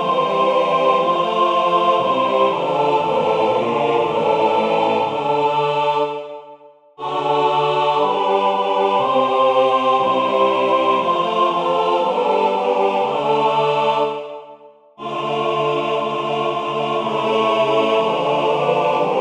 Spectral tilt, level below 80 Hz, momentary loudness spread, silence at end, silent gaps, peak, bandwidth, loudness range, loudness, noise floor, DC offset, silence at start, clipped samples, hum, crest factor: -5.5 dB/octave; -66 dBFS; 5 LU; 0 s; none; -2 dBFS; 10 kHz; 4 LU; -17 LUFS; -44 dBFS; under 0.1%; 0 s; under 0.1%; none; 16 dB